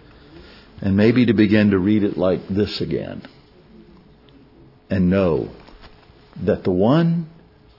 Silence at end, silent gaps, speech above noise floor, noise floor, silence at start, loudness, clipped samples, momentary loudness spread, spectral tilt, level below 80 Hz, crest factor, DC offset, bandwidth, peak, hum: 0.5 s; none; 31 dB; -49 dBFS; 0.75 s; -19 LUFS; under 0.1%; 12 LU; -9 dB/octave; -50 dBFS; 18 dB; under 0.1%; 5.8 kHz; -2 dBFS; none